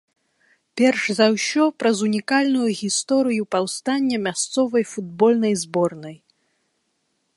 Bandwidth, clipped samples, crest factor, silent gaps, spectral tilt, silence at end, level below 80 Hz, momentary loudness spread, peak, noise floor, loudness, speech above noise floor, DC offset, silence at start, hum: 11.5 kHz; under 0.1%; 20 dB; none; -4 dB/octave; 1.2 s; -70 dBFS; 5 LU; -2 dBFS; -71 dBFS; -20 LUFS; 51 dB; under 0.1%; 0.75 s; none